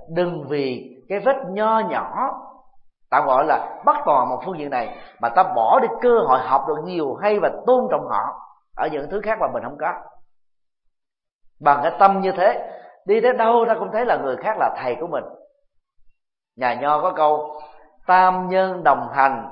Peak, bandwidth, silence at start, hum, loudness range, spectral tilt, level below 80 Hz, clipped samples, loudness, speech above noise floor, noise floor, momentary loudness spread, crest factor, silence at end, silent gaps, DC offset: 0 dBFS; 5.4 kHz; 0 s; none; 6 LU; -10.5 dB/octave; -58 dBFS; under 0.1%; -20 LUFS; 62 dB; -81 dBFS; 11 LU; 20 dB; 0 s; 11.33-11.39 s; under 0.1%